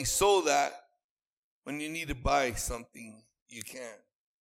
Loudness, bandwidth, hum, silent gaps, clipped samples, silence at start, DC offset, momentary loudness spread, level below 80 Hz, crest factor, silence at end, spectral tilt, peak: -30 LUFS; 16.5 kHz; none; 1.04-1.62 s, 3.42-3.46 s; under 0.1%; 0 s; under 0.1%; 24 LU; -48 dBFS; 22 dB; 0.45 s; -2.5 dB/octave; -12 dBFS